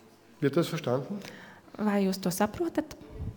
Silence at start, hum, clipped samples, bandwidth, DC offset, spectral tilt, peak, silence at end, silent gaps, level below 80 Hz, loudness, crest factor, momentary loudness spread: 0.4 s; none; under 0.1%; over 20 kHz; under 0.1%; -6 dB/octave; -14 dBFS; 0 s; none; -54 dBFS; -30 LUFS; 18 dB; 16 LU